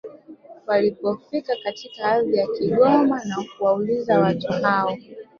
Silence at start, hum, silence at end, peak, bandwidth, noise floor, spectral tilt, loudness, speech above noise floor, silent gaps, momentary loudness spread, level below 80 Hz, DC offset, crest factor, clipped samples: 0.05 s; none; 0.15 s; -4 dBFS; 7.2 kHz; -44 dBFS; -7 dB/octave; -21 LUFS; 24 dB; none; 11 LU; -62 dBFS; under 0.1%; 16 dB; under 0.1%